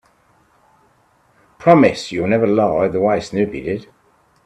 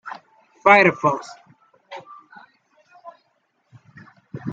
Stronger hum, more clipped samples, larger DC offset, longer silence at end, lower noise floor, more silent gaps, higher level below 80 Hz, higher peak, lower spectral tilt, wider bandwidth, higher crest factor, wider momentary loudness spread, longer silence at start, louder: neither; neither; neither; first, 0.6 s vs 0 s; second, -57 dBFS vs -68 dBFS; neither; first, -52 dBFS vs -68 dBFS; about the same, 0 dBFS vs -2 dBFS; about the same, -7 dB/octave vs -6 dB/octave; first, 11 kHz vs 8 kHz; about the same, 18 dB vs 22 dB; second, 12 LU vs 27 LU; first, 1.6 s vs 0.05 s; about the same, -16 LUFS vs -16 LUFS